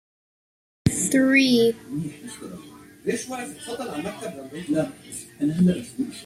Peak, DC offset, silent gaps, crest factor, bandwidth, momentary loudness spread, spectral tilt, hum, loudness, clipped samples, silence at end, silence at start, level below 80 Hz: -6 dBFS; under 0.1%; none; 20 dB; 15.5 kHz; 20 LU; -4.5 dB/octave; none; -23 LUFS; under 0.1%; 0 s; 0.85 s; -54 dBFS